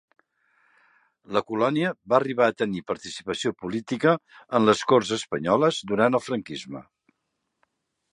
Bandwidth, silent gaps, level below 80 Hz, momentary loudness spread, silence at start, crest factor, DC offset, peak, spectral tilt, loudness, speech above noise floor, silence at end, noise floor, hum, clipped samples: 11 kHz; none; -64 dBFS; 11 LU; 1.3 s; 22 dB; under 0.1%; -4 dBFS; -5 dB/octave; -24 LUFS; 55 dB; 1.3 s; -79 dBFS; none; under 0.1%